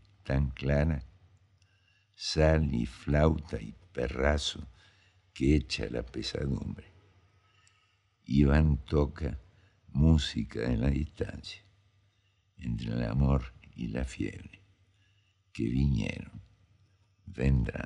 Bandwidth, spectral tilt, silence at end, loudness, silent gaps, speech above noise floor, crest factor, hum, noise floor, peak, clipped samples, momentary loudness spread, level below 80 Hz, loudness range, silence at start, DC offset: 10.5 kHz; -7 dB/octave; 0 s; -31 LUFS; none; 42 dB; 20 dB; none; -71 dBFS; -10 dBFS; under 0.1%; 18 LU; -38 dBFS; 5 LU; 0.25 s; under 0.1%